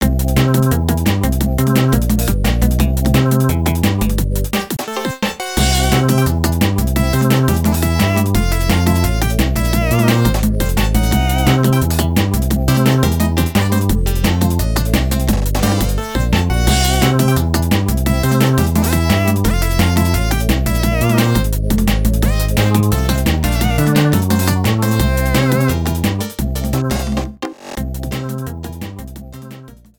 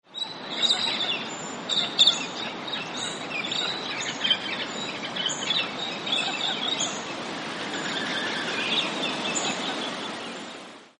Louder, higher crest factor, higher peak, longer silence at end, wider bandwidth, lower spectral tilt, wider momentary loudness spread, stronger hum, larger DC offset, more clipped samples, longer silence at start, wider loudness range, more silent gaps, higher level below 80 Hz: first, -15 LUFS vs -26 LUFS; second, 14 dB vs 22 dB; first, 0 dBFS vs -6 dBFS; first, 0.25 s vs 0.1 s; first, 19.5 kHz vs 11.5 kHz; first, -5.5 dB/octave vs -1.5 dB/octave; second, 7 LU vs 10 LU; neither; neither; neither; about the same, 0 s vs 0.1 s; about the same, 2 LU vs 3 LU; neither; first, -20 dBFS vs -72 dBFS